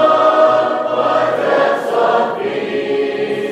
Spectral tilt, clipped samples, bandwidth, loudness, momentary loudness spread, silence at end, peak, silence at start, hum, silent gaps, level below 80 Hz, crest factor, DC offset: -5 dB/octave; under 0.1%; 11 kHz; -15 LUFS; 8 LU; 0 s; 0 dBFS; 0 s; none; none; -68 dBFS; 14 dB; under 0.1%